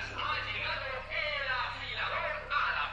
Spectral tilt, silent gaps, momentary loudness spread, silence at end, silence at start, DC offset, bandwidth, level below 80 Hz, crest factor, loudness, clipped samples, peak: -3.5 dB/octave; none; 4 LU; 0 s; 0 s; under 0.1%; 11 kHz; -52 dBFS; 16 dB; -33 LUFS; under 0.1%; -20 dBFS